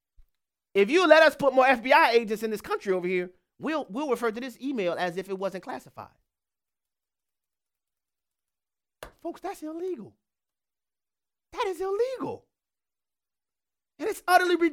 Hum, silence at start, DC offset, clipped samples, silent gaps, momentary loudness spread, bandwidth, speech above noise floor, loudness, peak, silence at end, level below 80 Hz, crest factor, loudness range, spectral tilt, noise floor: none; 0.75 s; under 0.1%; under 0.1%; none; 18 LU; 17 kHz; over 65 dB; -25 LUFS; -2 dBFS; 0 s; -66 dBFS; 24 dB; 19 LU; -4.5 dB/octave; under -90 dBFS